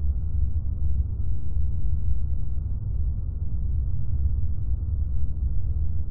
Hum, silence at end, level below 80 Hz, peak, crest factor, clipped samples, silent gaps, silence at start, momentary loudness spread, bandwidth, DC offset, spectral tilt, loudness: none; 0 s; -28 dBFS; -10 dBFS; 10 dB; under 0.1%; none; 0 s; 3 LU; 1.4 kHz; under 0.1%; -15.5 dB/octave; -29 LUFS